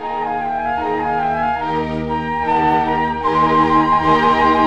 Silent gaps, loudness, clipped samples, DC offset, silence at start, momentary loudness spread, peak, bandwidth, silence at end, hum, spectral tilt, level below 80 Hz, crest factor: none; -17 LUFS; under 0.1%; 0.7%; 0 s; 7 LU; -2 dBFS; 9 kHz; 0 s; none; -6.5 dB/octave; -40 dBFS; 14 dB